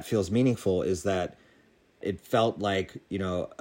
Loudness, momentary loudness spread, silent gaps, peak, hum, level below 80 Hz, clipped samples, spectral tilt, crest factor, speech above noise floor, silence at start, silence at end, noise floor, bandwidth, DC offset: -29 LUFS; 10 LU; none; -12 dBFS; none; -58 dBFS; under 0.1%; -6 dB/octave; 16 dB; 34 dB; 0 s; 0.05 s; -62 dBFS; 16 kHz; under 0.1%